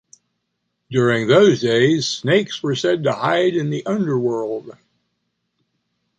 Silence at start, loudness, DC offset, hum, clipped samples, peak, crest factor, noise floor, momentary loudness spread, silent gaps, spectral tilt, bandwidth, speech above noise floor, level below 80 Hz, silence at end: 0.9 s; -18 LUFS; under 0.1%; none; under 0.1%; -2 dBFS; 18 dB; -74 dBFS; 10 LU; none; -5.5 dB/octave; 9 kHz; 57 dB; -62 dBFS; 1.5 s